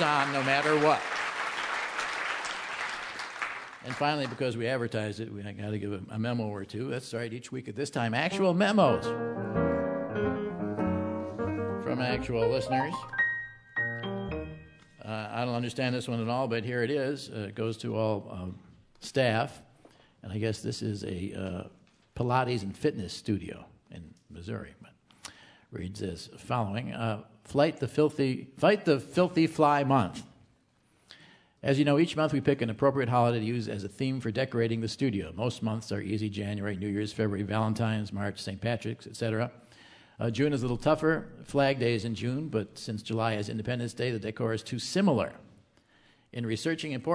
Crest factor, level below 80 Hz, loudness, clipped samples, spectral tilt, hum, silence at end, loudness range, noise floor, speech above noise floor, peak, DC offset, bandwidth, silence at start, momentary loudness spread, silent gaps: 22 dB; -58 dBFS; -30 LUFS; under 0.1%; -6 dB/octave; none; 0 s; 6 LU; -67 dBFS; 38 dB; -8 dBFS; under 0.1%; 11 kHz; 0 s; 13 LU; none